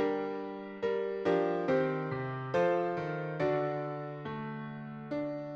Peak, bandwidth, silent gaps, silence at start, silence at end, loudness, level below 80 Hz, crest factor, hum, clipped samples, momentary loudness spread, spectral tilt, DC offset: -18 dBFS; 7.4 kHz; none; 0 s; 0 s; -34 LUFS; -70 dBFS; 14 dB; none; under 0.1%; 10 LU; -8 dB/octave; under 0.1%